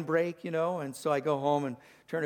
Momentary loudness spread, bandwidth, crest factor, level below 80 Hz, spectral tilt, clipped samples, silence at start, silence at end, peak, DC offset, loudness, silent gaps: 9 LU; 19 kHz; 16 dB; -80 dBFS; -6 dB/octave; under 0.1%; 0 s; 0 s; -16 dBFS; under 0.1%; -31 LUFS; none